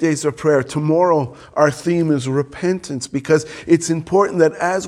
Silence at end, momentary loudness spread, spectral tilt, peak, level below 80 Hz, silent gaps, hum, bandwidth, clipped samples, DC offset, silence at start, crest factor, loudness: 0 s; 6 LU; -6 dB/octave; 0 dBFS; -54 dBFS; none; none; 12.5 kHz; under 0.1%; under 0.1%; 0 s; 18 dB; -18 LUFS